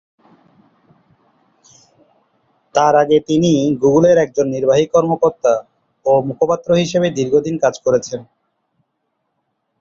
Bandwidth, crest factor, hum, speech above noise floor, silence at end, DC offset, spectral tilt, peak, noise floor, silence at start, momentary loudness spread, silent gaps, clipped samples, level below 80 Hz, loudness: 7.6 kHz; 16 dB; none; 57 dB; 1.6 s; under 0.1%; -6 dB/octave; -2 dBFS; -71 dBFS; 2.75 s; 6 LU; none; under 0.1%; -54 dBFS; -15 LUFS